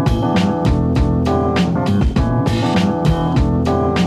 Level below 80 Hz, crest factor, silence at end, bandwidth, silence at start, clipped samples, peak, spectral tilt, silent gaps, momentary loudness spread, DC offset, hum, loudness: -24 dBFS; 12 dB; 0 s; 13 kHz; 0 s; under 0.1%; -4 dBFS; -7.5 dB/octave; none; 1 LU; under 0.1%; none; -16 LUFS